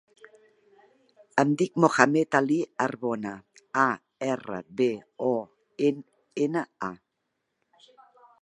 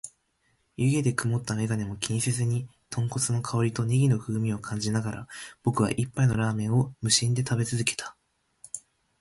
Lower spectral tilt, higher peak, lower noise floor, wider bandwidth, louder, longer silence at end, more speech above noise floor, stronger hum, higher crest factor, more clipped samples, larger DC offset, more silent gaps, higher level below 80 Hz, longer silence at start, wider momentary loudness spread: about the same, -6 dB/octave vs -5 dB/octave; first, 0 dBFS vs -6 dBFS; first, -80 dBFS vs -71 dBFS; about the same, 11.5 kHz vs 11.5 kHz; about the same, -27 LUFS vs -27 LUFS; first, 1.45 s vs 0.4 s; first, 54 dB vs 45 dB; neither; first, 28 dB vs 22 dB; neither; neither; neither; second, -76 dBFS vs -56 dBFS; first, 1.35 s vs 0.05 s; about the same, 15 LU vs 14 LU